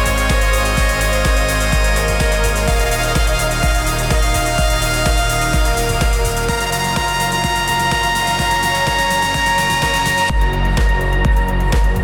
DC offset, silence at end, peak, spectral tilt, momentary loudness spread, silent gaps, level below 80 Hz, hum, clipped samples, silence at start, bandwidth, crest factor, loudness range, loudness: under 0.1%; 0 s; -2 dBFS; -3.5 dB/octave; 2 LU; none; -18 dBFS; none; under 0.1%; 0 s; 19 kHz; 12 dB; 1 LU; -16 LUFS